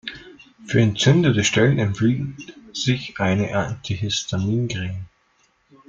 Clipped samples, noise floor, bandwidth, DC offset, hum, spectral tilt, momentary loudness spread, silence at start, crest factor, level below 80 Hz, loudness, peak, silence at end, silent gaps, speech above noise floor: under 0.1%; -63 dBFS; 7.6 kHz; under 0.1%; none; -5 dB/octave; 16 LU; 0.05 s; 18 dB; -50 dBFS; -21 LUFS; -2 dBFS; 0.85 s; none; 43 dB